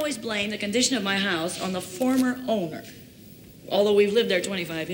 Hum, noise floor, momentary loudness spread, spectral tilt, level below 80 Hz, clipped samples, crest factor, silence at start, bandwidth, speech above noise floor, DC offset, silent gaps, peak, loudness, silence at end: none; -47 dBFS; 10 LU; -3.5 dB/octave; -62 dBFS; under 0.1%; 16 dB; 0 s; 17 kHz; 22 dB; under 0.1%; none; -8 dBFS; -24 LUFS; 0 s